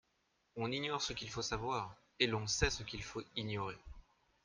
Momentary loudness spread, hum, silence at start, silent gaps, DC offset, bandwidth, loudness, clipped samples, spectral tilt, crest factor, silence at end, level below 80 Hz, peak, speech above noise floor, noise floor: 10 LU; none; 0.55 s; none; under 0.1%; 10.5 kHz; -39 LUFS; under 0.1%; -3.5 dB/octave; 26 dB; 0.45 s; -54 dBFS; -16 dBFS; 40 dB; -79 dBFS